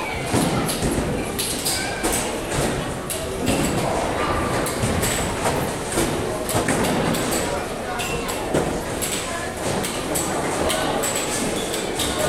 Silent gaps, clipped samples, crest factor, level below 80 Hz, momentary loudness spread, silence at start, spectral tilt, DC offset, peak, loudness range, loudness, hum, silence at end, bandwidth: none; under 0.1%; 16 dB; -38 dBFS; 4 LU; 0 s; -3.5 dB/octave; under 0.1%; -6 dBFS; 2 LU; -23 LUFS; none; 0 s; 17 kHz